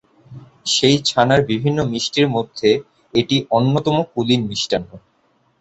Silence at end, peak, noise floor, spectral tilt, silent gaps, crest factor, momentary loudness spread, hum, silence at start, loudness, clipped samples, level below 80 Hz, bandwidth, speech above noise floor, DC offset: 0.6 s; -2 dBFS; -61 dBFS; -5 dB/octave; none; 18 dB; 7 LU; none; 0.3 s; -18 LUFS; under 0.1%; -50 dBFS; 8.2 kHz; 44 dB; under 0.1%